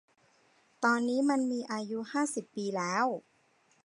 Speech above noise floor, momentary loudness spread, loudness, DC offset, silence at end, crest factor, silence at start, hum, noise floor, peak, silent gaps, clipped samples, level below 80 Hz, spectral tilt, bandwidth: 38 dB; 8 LU; -32 LUFS; under 0.1%; 0.65 s; 18 dB; 0.8 s; none; -69 dBFS; -14 dBFS; none; under 0.1%; -86 dBFS; -4.5 dB/octave; 11.5 kHz